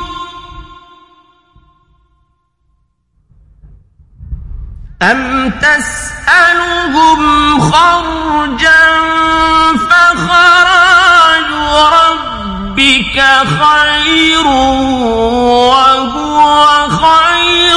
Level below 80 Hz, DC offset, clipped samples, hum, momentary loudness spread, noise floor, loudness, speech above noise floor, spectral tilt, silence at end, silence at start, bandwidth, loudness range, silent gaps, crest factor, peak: -30 dBFS; under 0.1%; 0.3%; none; 10 LU; -58 dBFS; -7 LUFS; 50 dB; -3 dB/octave; 0 s; 0 s; 12 kHz; 7 LU; none; 10 dB; 0 dBFS